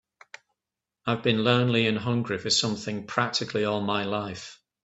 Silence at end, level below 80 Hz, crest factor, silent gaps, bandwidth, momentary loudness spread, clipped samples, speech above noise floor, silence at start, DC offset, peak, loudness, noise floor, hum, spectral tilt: 0.3 s; -64 dBFS; 22 dB; none; 8.4 kHz; 11 LU; under 0.1%; 62 dB; 1.05 s; under 0.1%; -6 dBFS; -26 LUFS; -88 dBFS; none; -4.5 dB/octave